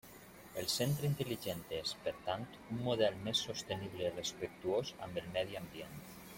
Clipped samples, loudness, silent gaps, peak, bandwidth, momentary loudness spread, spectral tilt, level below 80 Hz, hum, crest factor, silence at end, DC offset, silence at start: under 0.1%; -39 LUFS; none; -18 dBFS; 16.5 kHz; 13 LU; -4.5 dB/octave; -66 dBFS; none; 20 dB; 0 s; under 0.1%; 0.05 s